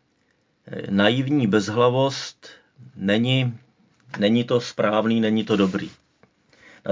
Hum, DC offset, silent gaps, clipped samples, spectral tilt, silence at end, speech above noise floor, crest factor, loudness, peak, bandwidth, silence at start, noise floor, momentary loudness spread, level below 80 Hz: none; under 0.1%; none; under 0.1%; -6 dB/octave; 0 s; 45 dB; 22 dB; -21 LUFS; -2 dBFS; 7.6 kHz; 0.65 s; -66 dBFS; 16 LU; -60 dBFS